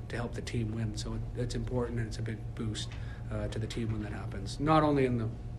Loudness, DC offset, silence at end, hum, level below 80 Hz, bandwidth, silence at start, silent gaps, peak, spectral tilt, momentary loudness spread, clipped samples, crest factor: -34 LUFS; under 0.1%; 0 s; none; -44 dBFS; 11.5 kHz; 0 s; none; -12 dBFS; -6.5 dB/octave; 11 LU; under 0.1%; 20 dB